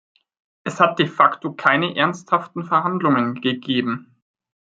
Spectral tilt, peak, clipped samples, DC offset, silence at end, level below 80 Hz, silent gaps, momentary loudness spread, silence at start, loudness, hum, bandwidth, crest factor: -6 dB/octave; 0 dBFS; under 0.1%; under 0.1%; 0.75 s; -68 dBFS; none; 8 LU; 0.65 s; -19 LUFS; none; 9 kHz; 20 dB